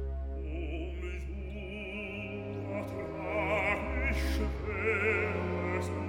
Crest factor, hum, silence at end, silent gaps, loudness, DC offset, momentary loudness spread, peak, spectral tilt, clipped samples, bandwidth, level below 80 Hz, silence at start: 16 dB; none; 0 s; none; -34 LUFS; under 0.1%; 10 LU; -16 dBFS; -6.5 dB/octave; under 0.1%; 16 kHz; -40 dBFS; 0 s